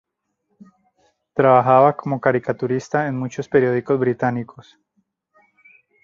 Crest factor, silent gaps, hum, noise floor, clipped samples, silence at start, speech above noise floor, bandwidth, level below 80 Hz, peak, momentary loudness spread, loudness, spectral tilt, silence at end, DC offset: 18 dB; none; none; -72 dBFS; under 0.1%; 1.35 s; 54 dB; 7.4 kHz; -62 dBFS; -2 dBFS; 12 LU; -19 LUFS; -8 dB/octave; 1.45 s; under 0.1%